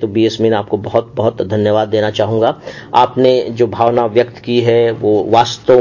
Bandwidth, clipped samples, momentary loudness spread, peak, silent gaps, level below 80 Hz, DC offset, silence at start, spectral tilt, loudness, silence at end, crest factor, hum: 7.4 kHz; under 0.1%; 5 LU; 0 dBFS; none; -48 dBFS; under 0.1%; 0 s; -6.5 dB/octave; -13 LUFS; 0 s; 12 dB; none